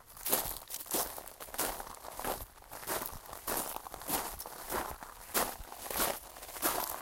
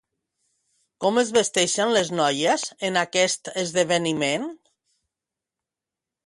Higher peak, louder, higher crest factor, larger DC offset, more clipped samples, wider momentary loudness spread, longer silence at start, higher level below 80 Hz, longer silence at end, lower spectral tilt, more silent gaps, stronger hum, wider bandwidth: second, -10 dBFS vs -6 dBFS; second, -36 LUFS vs -22 LUFS; first, 28 dB vs 18 dB; neither; neither; first, 11 LU vs 6 LU; second, 0 s vs 1 s; first, -56 dBFS vs -68 dBFS; second, 0 s vs 1.7 s; about the same, -1.5 dB/octave vs -2.5 dB/octave; neither; neither; first, 17 kHz vs 11.5 kHz